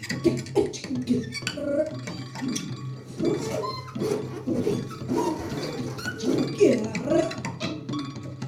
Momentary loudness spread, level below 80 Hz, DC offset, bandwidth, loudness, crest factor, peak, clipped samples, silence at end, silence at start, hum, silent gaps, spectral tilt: 8 LU; -58 dBFS; under 0.1%; 15.5 kHz; -28 LUFS; 20 dB; -8 dBFS; under 0.1%; 0 s; 0 s; none; none; -5.5 dB/octave